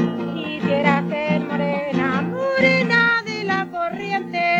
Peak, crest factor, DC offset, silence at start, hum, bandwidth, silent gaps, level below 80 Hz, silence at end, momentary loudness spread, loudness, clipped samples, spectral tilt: -2 dBFS; 18 dB; under 0.1%; 0 s; none; 7.8 kHz; none; -62 dBFS; 0 s; 9 LU; -20 LUFS; under 0.1%; -6.5 dB/octave